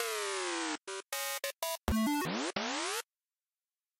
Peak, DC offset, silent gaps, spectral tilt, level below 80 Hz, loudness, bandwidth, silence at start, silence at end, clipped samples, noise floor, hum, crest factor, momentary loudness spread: -14 dBFS; under 0.1%; none; -3 dB/octave; -52 dBFS; -35 LUFS; 16 kHz; 0 s; 1 s; under 0.1%; under -90 dBFS; none; 22 dB; 7 LU